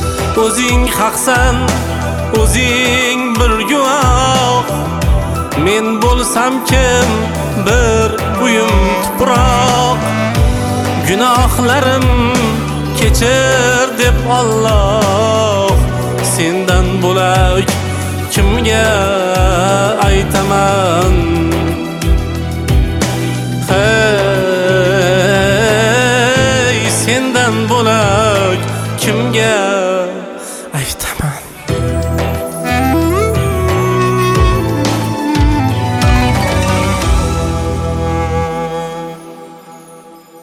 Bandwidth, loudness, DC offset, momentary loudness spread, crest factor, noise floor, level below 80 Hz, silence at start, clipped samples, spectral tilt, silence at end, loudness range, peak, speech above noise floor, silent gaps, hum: 17 kHz; -12 LUFS; under 0.1%; 7 LU; 12 dB; -36 dBFS; -20 dBFS; 0 s; under 0.1%; -4.5 dB/octave; 0 s; 4 LU; 0 dBFS; 25 dB; none; none